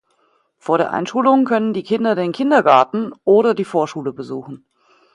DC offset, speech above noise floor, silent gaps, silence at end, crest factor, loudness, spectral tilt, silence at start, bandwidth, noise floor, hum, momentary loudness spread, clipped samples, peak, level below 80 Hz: under 0.1%; 45 dB; none; 0.6 s; 18 dB; -17 LUFS; -6.5 dB/octave; 0.65 s; 10.5 kHz; -62 dBFS; none; 15 LU; under 0.1%; 0 dBFS; -66 dBFS